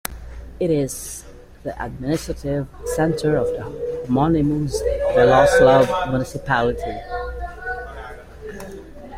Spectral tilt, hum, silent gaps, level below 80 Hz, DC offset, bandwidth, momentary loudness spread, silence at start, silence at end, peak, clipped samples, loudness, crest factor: -6 dB/octave; none; none; -36 dBFS; under 0.1%; 16 kHz; 22 LU; 0.1 s; 0 s; -2 dBFS; under 0.1%; -20 LUFS; 18 dB